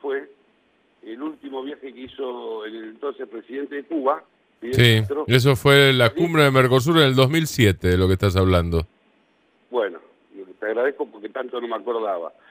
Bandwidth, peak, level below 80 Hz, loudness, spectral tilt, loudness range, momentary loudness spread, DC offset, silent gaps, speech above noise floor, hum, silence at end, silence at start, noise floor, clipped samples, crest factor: 15.5 kHz; 0 dBFS; -44 dBFS; -20 LUFS; -5.5 dB/octave; 15 LU; 17 LU; under 0.1%; none; 42 dB; none; 0.2 s; 0.05 s; -62 dBFS; under 0.1%; 20 dB